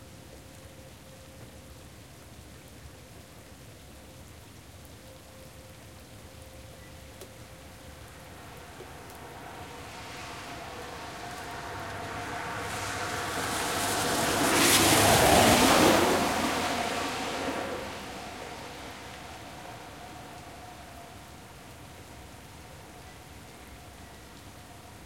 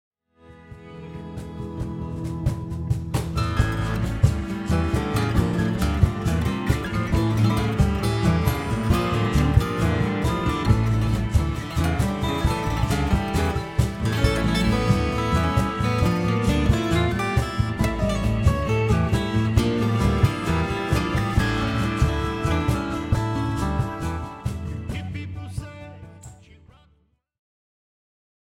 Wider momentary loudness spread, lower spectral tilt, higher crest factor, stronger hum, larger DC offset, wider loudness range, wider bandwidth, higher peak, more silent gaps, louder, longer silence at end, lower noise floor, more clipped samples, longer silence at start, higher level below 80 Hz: first, 28 LU vs 10 LU; second, -3 dB/octave vs -6.5 dB/octave; about the same, 24 dB vs 20 dB; neither; neither; first, 26 LU vs 8 LU; about the same, 16.5 kHz vs 16.5 kHz; second, -8 dBFS vs -4 dBFS; neither; second, -26 LUFS vs -23 LUFS; second, 0 s vs 2.2 s; second, -49 dBFS vs -64 dBFS; neither; second, 0 s vs 0.5 s; second, -52 dBFS vs -30 dBFS